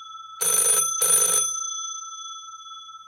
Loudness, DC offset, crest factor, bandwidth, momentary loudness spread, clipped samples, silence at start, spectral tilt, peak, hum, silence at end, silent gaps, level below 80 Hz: -19 LUFS; under 0.1%; 18 dB; 16.5 kHz; 22 LU; under 0.1%; 0 s; 1.5 dB/octave; -6 dBFS; none; 0.05 s; none; -76 dBFS